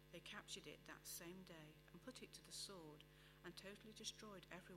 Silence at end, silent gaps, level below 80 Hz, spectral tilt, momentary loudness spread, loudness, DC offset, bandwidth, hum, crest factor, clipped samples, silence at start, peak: 0 s; none; -76 dBFS; -2.5 dB/octave; 9 LU; -57 LUFS; under 0.1%; 16 kHz; none; 24 dB; under 0.1%; 0 s; -34 dBFS